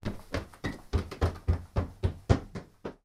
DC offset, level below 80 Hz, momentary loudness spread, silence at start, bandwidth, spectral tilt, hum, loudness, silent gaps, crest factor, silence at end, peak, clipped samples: under 0.1%; -38 dBFS; 11 LU; 0.05 s; 12.5 kHz; -7 dB/octave; none; -33 LUFS; none; 22 dB; 0.1 s; -10 dBFS; under 0.1%